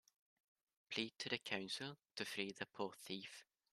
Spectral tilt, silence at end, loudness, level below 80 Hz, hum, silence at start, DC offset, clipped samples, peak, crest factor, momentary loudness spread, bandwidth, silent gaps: -3 dB/octave; 0.3 s; -46 LUFS; -88 dBFS; none; 0.9 s; under 0.1%; under 0.1%; -24 dBFS; 26 dB; 7 LU; 13.5 kHz; none